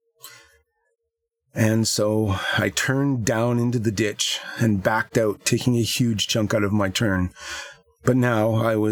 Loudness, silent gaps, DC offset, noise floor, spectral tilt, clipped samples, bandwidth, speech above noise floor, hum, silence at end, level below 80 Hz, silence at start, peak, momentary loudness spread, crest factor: -22 LUFS; none; under 0.1%; -79 dBFS; -5 dB/octave; under 0.1%; 19.5 kHz; 58 dB; none; 0 s; -52 dBFS; 0.25 s; -4 dBFS; 5 LU; 18 dB